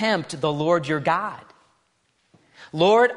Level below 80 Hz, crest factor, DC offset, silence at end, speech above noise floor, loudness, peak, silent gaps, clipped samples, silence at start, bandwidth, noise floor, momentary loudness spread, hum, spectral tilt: -66 dBFS; 16 dB; under 0.1%; 0 s; 47 dB; -22 LUFS; -6 dBFS; none; under 0.1%; 0 s; 10.5 kHz; -68 dBFS; 15 LU; none; -5.5 dB/octave